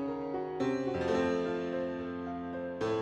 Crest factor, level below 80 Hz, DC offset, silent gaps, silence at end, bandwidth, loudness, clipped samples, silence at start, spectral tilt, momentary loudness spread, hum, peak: 14 dB; -64 dBFS; under 0.1%; none; 0 s; 9.4 kHz; -34 LUFS; under 0.1%; 0 s; -6.5 dB/octave; 8 LU; none; -20 dBFS